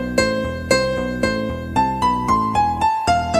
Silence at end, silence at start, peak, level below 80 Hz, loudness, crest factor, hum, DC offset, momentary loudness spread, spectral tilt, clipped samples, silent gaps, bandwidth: 0 s; 0 s; -2 dBFS; -36 dBFS; -19 LUFS; 18 dB; none; under 0.1%; 4 LU; -5 dB/octave; under 0.1%; none; 15.5 kHz